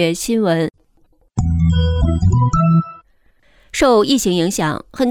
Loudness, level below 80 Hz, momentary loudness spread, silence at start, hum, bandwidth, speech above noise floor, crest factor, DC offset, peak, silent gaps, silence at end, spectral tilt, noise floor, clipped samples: -16 LUFS; -28 dBFS; 9 LU; 0 s; none; 16 kHz; 40 dB; 14 dB; under 0.1%; -4 dBFS; none; 0 s; -6 dB/octave; -55 dBFS; under 0.1%